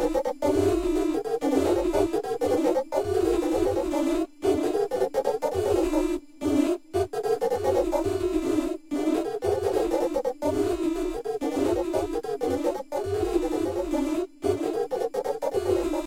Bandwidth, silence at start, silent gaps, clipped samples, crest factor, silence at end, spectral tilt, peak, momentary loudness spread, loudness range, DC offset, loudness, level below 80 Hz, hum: 16.5 kHz; 0 s; none; under 0.1%; 14 dB; 0 s; -6 dB/octave; -10 dBFS; 5 LU; 3 LU; under 0.1%; -26 LUFS; -44 dBFS; none